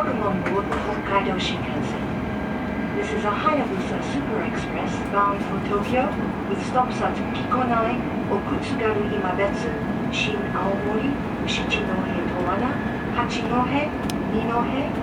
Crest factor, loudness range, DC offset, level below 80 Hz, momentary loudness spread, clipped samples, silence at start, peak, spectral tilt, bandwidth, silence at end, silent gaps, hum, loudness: 16 dB; 1 LU; under 0.1%; -40 dBFS; 5 LU; under 0.1%; 0 s; -6 dBFS; -6 dB/octave; 16 kHz; 0 s; none; none; -24 LUFS